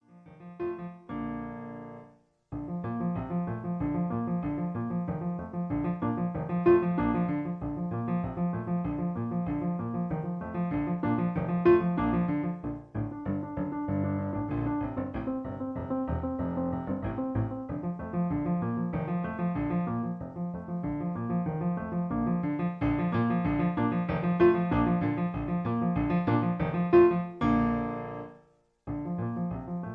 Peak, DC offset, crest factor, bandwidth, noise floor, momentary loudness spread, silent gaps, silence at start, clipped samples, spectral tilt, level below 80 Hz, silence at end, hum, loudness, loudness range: -10 dBFS; under 0.1%; 20 dB; 4.2 kHz; -63 dBFS; 12 LU; none; 0.1 s; under 0.1%; -11 dB/octave; -48 dBFS; 0 s; none; -30 LUFS; 6 LU